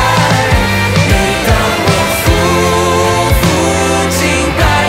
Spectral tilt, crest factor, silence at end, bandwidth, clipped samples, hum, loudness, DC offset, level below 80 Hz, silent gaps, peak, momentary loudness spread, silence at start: -4.5 dB/octave; 10 dB; 0 s; 16.5 kHz; under 0.1%; none; -10 LUFS; under 0.1%; -20 dBFS; none; 0 dBFS; 1 LU; 0 s